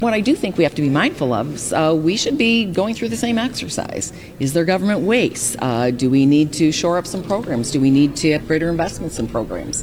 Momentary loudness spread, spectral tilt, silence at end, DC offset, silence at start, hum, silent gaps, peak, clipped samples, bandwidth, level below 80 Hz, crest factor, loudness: 8 LU; -5 dB/octave; 0 s; under 0.1%; 0 s; none; none; -4 dBFS; under 0.1%; 16.5 kHz; -44 dBFS; 14 dB; -18 LUFS